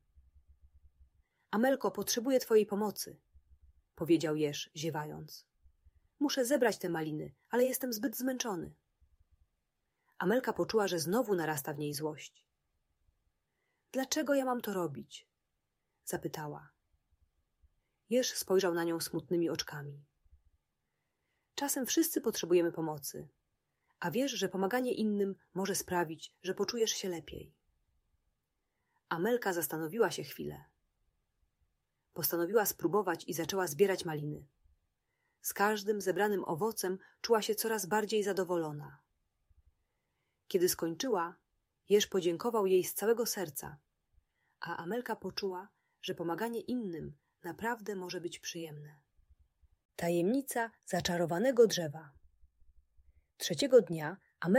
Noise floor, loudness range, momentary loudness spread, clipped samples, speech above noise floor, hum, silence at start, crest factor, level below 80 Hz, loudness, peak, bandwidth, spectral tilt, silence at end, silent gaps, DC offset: -85 dBFS; 6 LU; 14 LU; under 0.1%; 51 dB; none; 0.15 s; 22 dB; -70 dBFS; -34 LUFS; -12 dBFS; 16 kHz; -4 dB/octave; 0 s; 49.85-49.89 s; under 0.1%